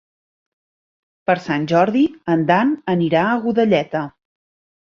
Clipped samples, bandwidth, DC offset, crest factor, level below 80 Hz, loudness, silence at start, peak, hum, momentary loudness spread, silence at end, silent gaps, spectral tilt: under 0.1%; 7.2 kHz; under 0.1%; 18 dB; -60 dBFS; -18 LUFS; 1.3 s; -2 dBFS; none; 9 LU; 0.8 s; none; -7.5 dB/octave